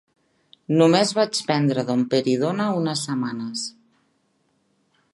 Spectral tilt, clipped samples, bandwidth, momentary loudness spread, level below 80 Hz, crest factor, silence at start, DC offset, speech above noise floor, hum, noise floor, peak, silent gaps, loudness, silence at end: -5 dB/octave; under 0.1%; 11.5 kHz; 11 LU; -72 dBFS; 18 dB; 0.7 s; under 0.1%; 47 dB; none; -67 dBFS; -4 dBFS; none; -21 LUFS; 1.45 s